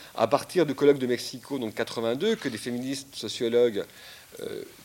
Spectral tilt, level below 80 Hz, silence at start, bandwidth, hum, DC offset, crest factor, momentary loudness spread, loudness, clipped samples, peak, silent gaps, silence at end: -4.5 dB/octave; -70 dBFS; 0 s; 17 kHz; none; under 0.1%; 20 dB; 15 LU; -27 LUFS; under 0.1%; -8 dBFS; none; 0 s